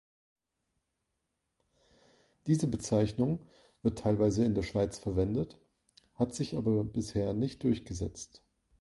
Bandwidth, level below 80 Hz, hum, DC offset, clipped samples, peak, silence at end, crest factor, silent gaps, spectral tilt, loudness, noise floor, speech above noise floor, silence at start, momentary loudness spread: 11.5 kHz; -52 dBFS; none; under 0.1%; under 0.1%; -14 dBFS; 0.45 s; 20 dB; none; -7 dB/octave; -32 LUFS; -83 dBFS; 52 dB; 2.45 s; 10 LU